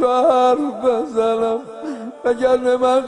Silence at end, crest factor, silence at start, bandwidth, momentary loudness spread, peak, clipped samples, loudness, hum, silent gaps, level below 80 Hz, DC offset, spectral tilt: 0 s; 14 dB; 0 s; 10.5 kHz; 12 LU; -4 dBFS; under 0.1%; -17 LUFS; none; none; -56 dBFS; under 0.1%; -4.5 dB/octave